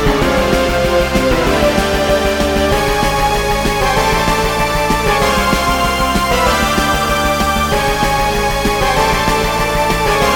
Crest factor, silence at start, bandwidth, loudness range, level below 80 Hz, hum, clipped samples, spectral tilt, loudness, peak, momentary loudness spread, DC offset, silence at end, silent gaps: 14 dB; 0 s; 17.5 kHz; 0 LU; -22 dBFS; none; under 0.1%; -4 dB/octave; -13 LUFS; 0 dBFS; 2 LU; 0.2%; 0 s; none